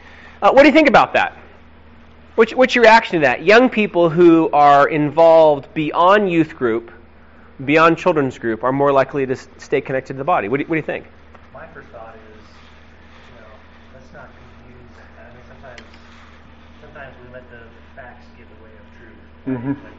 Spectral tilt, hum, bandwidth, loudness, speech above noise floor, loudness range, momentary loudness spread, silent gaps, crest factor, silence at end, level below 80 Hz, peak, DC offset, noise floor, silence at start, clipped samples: -4 dB/octave; none; 7.8 kHz; -14 LUFS; 31 dB; 13 LU; 15 LU; none; 16 dB; 0.2 s; -50 dBFS; -2 dBFS; 0.4%; -45 dBFS; 0.4 s; under 0.1%